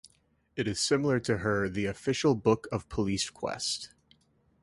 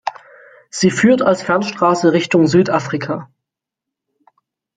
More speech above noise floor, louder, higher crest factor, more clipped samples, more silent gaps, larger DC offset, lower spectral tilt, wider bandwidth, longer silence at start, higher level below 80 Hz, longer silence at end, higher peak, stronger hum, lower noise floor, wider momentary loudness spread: second, 40 dB vs 69 dB; second, -30 LUFS vs -15 LUFS; about the same, 20 dB vs 16 dB; neither; neither; neither; about the same, -4.5 dB/octave vs -5.5 dB/octave; first, 11.5 kHz vs 9.4 kHz; first, 0.55 s vs 0.05 s; about the same, -54 dBFS vs -58 dBFS; second, 0.75 s vs 1.5 s; second, -10 dBFS vs 0 dBFS; neither; second, -69 dBFS vs -83 dBFS; second, 9 LU vs 13 LU